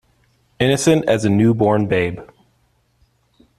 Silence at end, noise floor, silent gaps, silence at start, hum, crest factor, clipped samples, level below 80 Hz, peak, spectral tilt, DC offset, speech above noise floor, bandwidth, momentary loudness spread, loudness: 1.35 s; -62 dBFS; none; 0.6 s; none; 16 dB; under 0.1%; -50 dBFS; -2 dBFS; -6 dB/octave; under 0.1%; 46 dB; 13.5 kHz; 7 LU; -16 LUFS